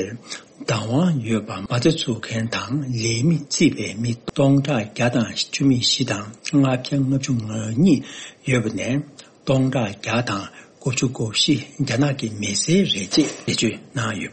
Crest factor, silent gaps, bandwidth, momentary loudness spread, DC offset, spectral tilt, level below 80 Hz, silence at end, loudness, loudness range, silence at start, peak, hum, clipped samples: 18 dB; none; 8.8 kHz; 9 LU; under 0.1%; -5 dB/octave; -54 dBFS; 0 s; -21 LUFS; 2 LU; 0 s; -4 dBFS; none; under 0.1%